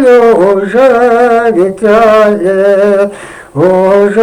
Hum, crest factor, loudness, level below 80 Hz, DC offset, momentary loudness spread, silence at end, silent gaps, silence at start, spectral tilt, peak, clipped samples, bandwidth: none; 6 dB; -7 LUFS; -44 dBFS; under 0.1%; 6 LU; 0 s; none; 0 s; -6.5 dB/octave; 0 dBFS; 0.3%; 12 kHz